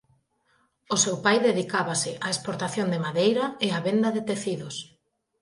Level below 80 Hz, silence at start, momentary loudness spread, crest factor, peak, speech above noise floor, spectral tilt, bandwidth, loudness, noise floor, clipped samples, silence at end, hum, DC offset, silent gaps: -70 dBFS; 0.9 s; 8 LU; 20 dB; -8 dBFS; 43 dB; -3.5 dB/octave; 11.5 kHz; -25 LUFS; -68 dBFS; under 0.1%; 0.6 s; none; under 0.1%; none